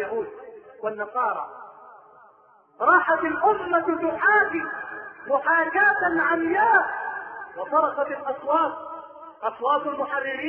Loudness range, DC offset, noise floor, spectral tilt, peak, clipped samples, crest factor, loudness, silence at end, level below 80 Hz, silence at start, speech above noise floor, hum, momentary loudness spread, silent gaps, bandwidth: 5 LU; under 0.1%; -56 dBFS; -8 dB/octave; -6 dBFS; under 0.1%; 18 dB; -23 LUFS; 0 s; -66 dBFS; 0 s; 33 dB; none; 18 LU; none; 4.3 kHz